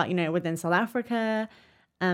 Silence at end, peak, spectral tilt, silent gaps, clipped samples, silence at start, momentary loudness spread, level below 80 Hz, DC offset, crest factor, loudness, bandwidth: 0 s; -10 dBFS; -6 dB/octave; none; under 0.1%; 0 s; 5 LU; -74 dBFS; under 0.1%; 18 dB; -28 LUFS; 16 kHz